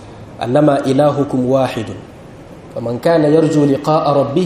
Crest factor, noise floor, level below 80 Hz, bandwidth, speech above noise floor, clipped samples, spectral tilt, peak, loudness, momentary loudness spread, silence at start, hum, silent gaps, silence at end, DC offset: 14 dB; -35 dBFS; -48 dBFS; 13.5 kHz; 22 dB; under 0.1%; -7.5 dB/octave; 0 dBFS; -14 LUFS; 15 LU; 0 s; none; none; 0 s; under 0.1%